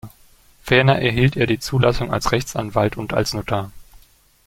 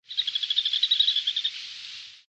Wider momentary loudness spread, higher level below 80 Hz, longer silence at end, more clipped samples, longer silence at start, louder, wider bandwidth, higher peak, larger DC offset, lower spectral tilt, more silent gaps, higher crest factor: second, 9 LU vs 17 LU; first, -38 dBFS vs -68 dBFS; first, 0.5 s vs 0.1 s; neither; about the same, 0.05 s vs 0.1 s; first, -19 LUFS vs -23 LUFS; first, 16 kHz vs 9.2 kHz; first, -2 dBFS vs -10 dBFS; neither; first, -5.5 dB/octave vs 3.5 dB/octave; neither; about the same, 18 dB vs 18 dB